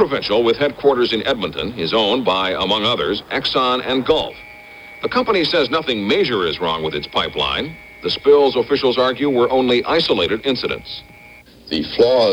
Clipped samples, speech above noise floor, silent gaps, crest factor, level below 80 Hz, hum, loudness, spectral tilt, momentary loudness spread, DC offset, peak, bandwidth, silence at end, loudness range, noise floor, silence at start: under 0.1%; 26 dB; none; 16 dB; -46 dBFS; none; -17 LUFS; -5.5 dB/octave; 9 LU; under 0.1%; -2 dBFS; 16.5 kHz; 0 s; 2 LU; -43 dBFS; 0 s